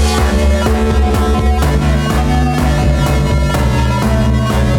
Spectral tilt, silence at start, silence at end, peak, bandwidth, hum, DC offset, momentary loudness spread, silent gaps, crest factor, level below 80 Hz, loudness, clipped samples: -6 dB/octave; 0 s; 0 s; 0 dBFS; 16.5 kHz; none; under 0.1%; 1 LU; none; 10 dB; -14 dBFS; -13 LUFS; under 0.1%